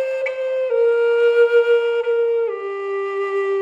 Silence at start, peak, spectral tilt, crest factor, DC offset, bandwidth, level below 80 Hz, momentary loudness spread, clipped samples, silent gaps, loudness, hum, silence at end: 0 s; -6 dBFS; -3 dB/octave; 12 dB; under 0.1%; 7.2 kHz; -72 dBFS; 9 LU; under 0.1%; none; -18 LUFS; none; 0 s